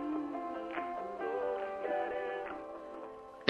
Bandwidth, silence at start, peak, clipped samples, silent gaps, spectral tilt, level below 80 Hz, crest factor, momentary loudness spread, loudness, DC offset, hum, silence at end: 10.5 kHz; 0 s; -8 dBFS; under 0.1%; none; -6 dB/octave; -70 dBFS; 30 dB; 10 LU; -39 LUFS; under 0.1%; none; 0 s